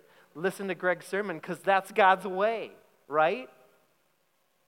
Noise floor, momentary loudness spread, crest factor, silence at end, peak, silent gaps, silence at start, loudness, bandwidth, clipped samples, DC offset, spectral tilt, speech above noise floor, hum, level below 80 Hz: -73 dBFS; 12 LU; 22 dB; 1.2 s; -8 dBFS; none; 0.35 s; -28 LUFS; 16.5 kHz; under 0.1%; under 0.1%; -5 dB/octave; 45 dB; none; under -90 dBFS